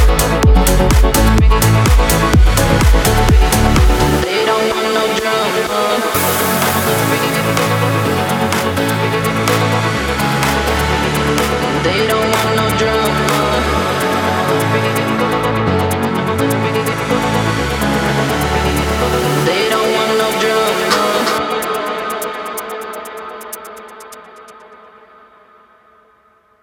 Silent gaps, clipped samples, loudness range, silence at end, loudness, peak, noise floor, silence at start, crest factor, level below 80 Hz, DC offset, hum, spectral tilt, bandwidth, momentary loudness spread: none; under 0.1%; 8 LU; 1.85 s; -14 LUFS; 0 dBFS; -52 dBFS; 0 s; 14 dB; -20 dBFS; under 0.1%; none; -4.5 dB/octave; 19.5 kHz; 7 LU